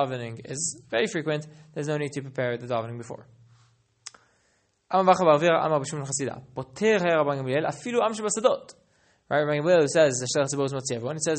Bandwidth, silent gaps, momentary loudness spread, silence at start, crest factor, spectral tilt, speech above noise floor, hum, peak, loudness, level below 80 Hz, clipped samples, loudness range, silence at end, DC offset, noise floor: 8.8 kHz; none; 17 LU; 0 s; 20 dB; -4.5 dB/octave; 44 dB; none; -6 dBFS; -25 LUFS; -68 dBFS; under 0.1%; 9 LU; 0 s; under 0.1%; -69 dBFS